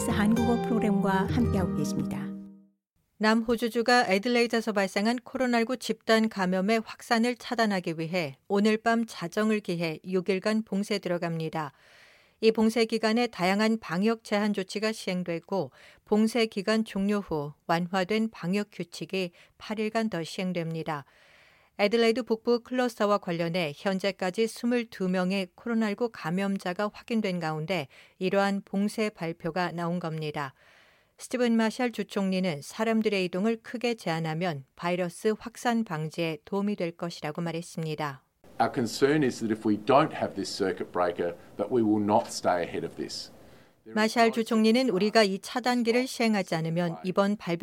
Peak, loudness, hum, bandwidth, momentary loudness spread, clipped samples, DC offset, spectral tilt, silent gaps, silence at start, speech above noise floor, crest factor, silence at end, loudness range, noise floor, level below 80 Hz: -8 dBFS; -28 LUFS; none; 16.5 kHz; 9 LU; under 0.1%; under 0.1%; -5.5 dB/octave; 2.91-2.96 s; 0 s; 46 dB; 20 dB; 0.05 s; 5 LU; -74 dBFS; -62 dBFS